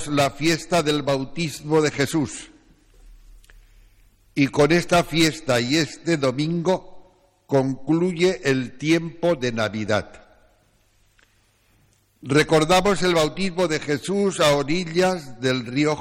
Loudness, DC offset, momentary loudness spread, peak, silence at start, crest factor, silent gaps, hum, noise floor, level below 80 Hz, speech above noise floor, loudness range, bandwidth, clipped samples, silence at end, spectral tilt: -21 LUFS; under 0.1%; 7 LU; -4 dBFS; 0 s; 18 dB; none; none; -61 dBFS; -48 dBFS; 40 dB; 6 LU; 16.5 kHz; under 0.1%; 0 s; -5 dB/octave